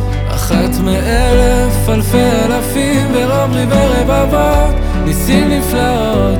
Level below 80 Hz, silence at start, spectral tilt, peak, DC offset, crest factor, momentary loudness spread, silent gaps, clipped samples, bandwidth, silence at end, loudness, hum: -16 dBFS; 0 s; -5.5 dB/octave; 0 dBFS; under 0.1%; 10 dB; 3 LU; none; under 0.1%; 19.5 kHz; 0 s; -12 LUFS; none